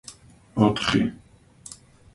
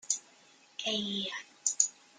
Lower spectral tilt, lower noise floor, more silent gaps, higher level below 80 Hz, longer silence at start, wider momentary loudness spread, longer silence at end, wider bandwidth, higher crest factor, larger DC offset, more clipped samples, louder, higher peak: first, -5.5 dB/octave vs -0.5 dB/octave; second, -48 dBFS vs -61 dBFS; neither; first, -50 dBFS vs -80 dBFS; about the same, 0.1 s vs 0.05 s; first, 24 LU vs 9 LU; first, 0.4 s vs 0.25 s; about the same, 11.5 kHz vs 10.5 kHz; second, 22 dB vs 28 dB; neither; neither; first, -23 LUFS vs -33 LUFS; first, -4 dBFS vs -8 dBFS